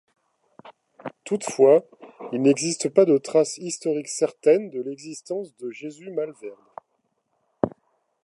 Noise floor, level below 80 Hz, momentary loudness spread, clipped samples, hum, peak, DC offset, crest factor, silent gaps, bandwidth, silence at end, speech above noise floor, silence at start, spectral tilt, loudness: -73 dBFS; -68 dBFS; 19 LU; under 0.1%; none; -2 dBFS; under 0.1%; 22 dB; none; 11.5 kHz; 0.55 s; 51 dB; 0.65 s; -5 dB/octave; -23 LUFS